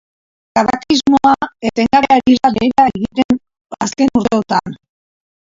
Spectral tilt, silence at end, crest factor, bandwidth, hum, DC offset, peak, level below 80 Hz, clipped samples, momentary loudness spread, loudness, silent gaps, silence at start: -4.5 dB/octave; 0.75 s; 14 dB; 7.8 kHz; none; under 0.1%; 0 dBFS; -46 dBFS; under 0.1%; 8 LU; -14 LUFS; 3.25-3.29 s, 3.61-3.65 s; 0.55 s